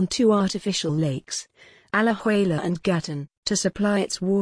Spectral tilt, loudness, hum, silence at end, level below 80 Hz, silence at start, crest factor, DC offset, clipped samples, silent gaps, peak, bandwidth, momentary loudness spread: -5 dB/octave; -24 LUFS; none; 0 s; -56 dBFS; 0 s; 14 dB; under 0.1%; under 0.1%; 3.37-3.43 s; -8 dBFS; 10.5 kHz; 10 LU